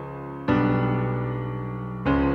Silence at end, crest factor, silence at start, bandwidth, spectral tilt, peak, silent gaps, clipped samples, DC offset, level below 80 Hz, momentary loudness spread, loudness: 0 s; 16 dB; 0 s; 5.4 kHz; -10 dB/octave; -10 dBFS; none; under 0.1%; under 0.1%; -40 dBFS; 10 LU; -26 LUFS